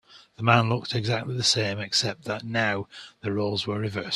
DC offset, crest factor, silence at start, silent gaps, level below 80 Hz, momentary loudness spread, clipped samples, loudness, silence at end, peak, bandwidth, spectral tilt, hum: under 0.1%; 24 dB; 0.1 s; none; -60 dBFS; 10 LU; under 0.1%; -25 LUFS; 0 s; -2 dBFS; 12.5 kHz; -4 dB/octave; none